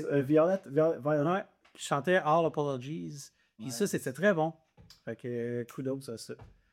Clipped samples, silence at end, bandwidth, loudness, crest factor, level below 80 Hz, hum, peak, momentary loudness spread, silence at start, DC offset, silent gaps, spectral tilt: under 0.1%; 0.25 s; 16.5 kHz; -31 LUFS; 18 dB; -72 dBFS; none; -14 dBFS; 19 LU; 0 s; under 0.1%; none; -6 dB/octave